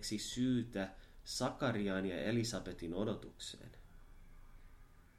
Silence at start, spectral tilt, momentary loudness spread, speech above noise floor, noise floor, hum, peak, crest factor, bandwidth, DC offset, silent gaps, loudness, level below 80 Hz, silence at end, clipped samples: 0 s; -5 dB/octave; 12 LU; 21 dB; -60 dBFS; none; -24 dBFS; 18 dB; 15.5 kHz; under 0.1%; none; -40 LUFS; -58 dBFS; 0.15 s; under 0.1%